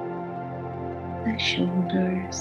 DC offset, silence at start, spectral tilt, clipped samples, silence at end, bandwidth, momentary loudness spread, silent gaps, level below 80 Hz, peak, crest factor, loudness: under 0.1%; 0 s; -5 dB/octave; under 0.1%; 0 s; 7.6 kHz; 10 LU; none; -60 dBFS; -12 dBFS; 16 dB; -27 LUFS